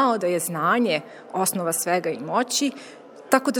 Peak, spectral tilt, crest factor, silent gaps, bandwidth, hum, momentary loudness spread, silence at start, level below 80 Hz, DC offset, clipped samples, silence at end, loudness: 0 dBFS; -3.5 dB/octave; 24 dB; none; over 20 kHz; none; 7 LU; 0 s; -78 dBFS; under 0.1%; under 0.1%; 0 s; -23 LUFS